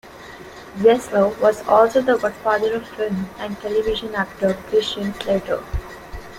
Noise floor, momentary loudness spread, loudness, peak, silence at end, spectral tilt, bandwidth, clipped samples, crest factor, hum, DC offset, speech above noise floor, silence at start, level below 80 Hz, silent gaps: -39 dBFS; 20 LU; -20 LUFS; -2 dBFS; 0 s; -5.5 dB/octave; 16 kHz; under 0.1%; 18 dB; none; under 0.1%; 19 dB; 0.05 s; -40 dBFS; none